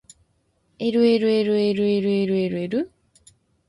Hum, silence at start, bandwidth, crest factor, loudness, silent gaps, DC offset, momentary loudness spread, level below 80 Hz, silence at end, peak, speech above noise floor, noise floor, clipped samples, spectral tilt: none; 0.8 s; 11.5 kHz; 16 dB; -21 LUFS; none; under 0.1%; 9 LU; -62 dBFS; 0.8 s; -8 dBFS; 47 dB; -67 dBFS; under 0.1%; -7 dB/octave